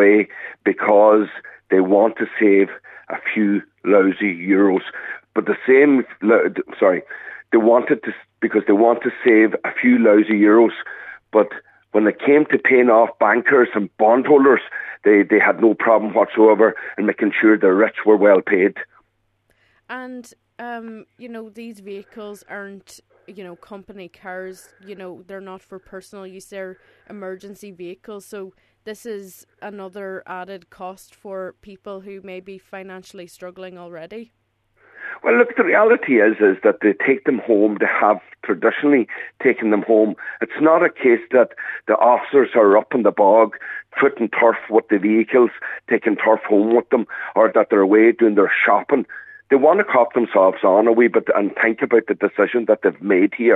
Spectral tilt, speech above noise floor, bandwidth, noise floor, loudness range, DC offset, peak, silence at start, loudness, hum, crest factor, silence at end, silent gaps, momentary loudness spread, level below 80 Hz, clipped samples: -7.5 dB/octave; 49 dB; 11 kHz; -66 dBFS; 20 LU; under 0.1%; 0 dBFS; 0 s; -16 LUFS; none; 18 dB; 0 s; none; 22 LU; -72 dBFS; under 0.1%